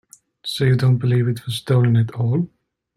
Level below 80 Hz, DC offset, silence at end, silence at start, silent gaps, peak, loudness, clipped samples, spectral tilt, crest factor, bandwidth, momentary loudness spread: -56 dBFS; under 0.1%; 0.5 s; 0.45 s; none; -4 dBFS; -19 LUFS; under 0.1%; -7 dB/octave; 14 dB; 13 kHz; 11 LU